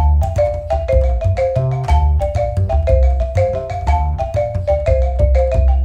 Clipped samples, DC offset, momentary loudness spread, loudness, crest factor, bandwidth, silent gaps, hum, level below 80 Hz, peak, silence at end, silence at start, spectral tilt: under 0.1%; under 0.1%; 4 LU; -17 LUFS; 12 dB; 7.6 kHz; none; none; -16 dBFS; -2 dBFS; 0 s; 0 s; -8 dB/octave